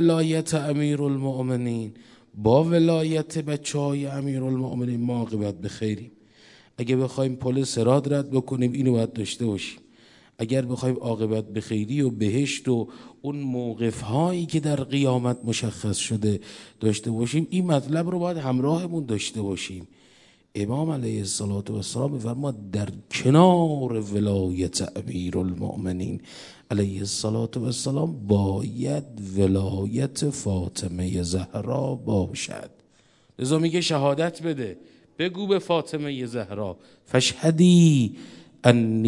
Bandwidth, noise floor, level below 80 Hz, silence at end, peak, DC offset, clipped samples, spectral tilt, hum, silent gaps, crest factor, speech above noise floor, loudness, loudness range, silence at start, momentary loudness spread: 11.5 kHz; -60 dBFS; -60 dBFS; 0 s; 0 dBFS; under 0.1%; under 0.1%; -6 dB/octave; none; none; 24 dB; 36 dB; -25 LUFS; 5 LU; 0 s; 10 LU